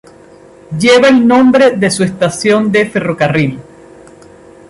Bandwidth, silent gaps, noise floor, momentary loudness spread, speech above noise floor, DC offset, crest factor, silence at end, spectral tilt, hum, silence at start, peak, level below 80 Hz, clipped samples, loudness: 11.5 kHz; none; -39 dBFS; 8 LU; 29 dB; under 0.1%; 10 dB; 1.05 s; -5 dB/octave; none; 0.7 s; 0 dBFS; -48 dBFS; under 0.1%; -10 LUFS